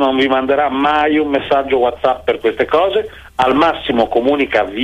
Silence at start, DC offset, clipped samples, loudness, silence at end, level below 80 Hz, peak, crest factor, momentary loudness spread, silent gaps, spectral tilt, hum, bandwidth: 0 s; under 0.1%; under 0.1%; -15 LUFS; 0 s; -42 dBFS; -2 dBFS; 12 dB; 4 LU; none; -6 dB/octave; none; 11 kHz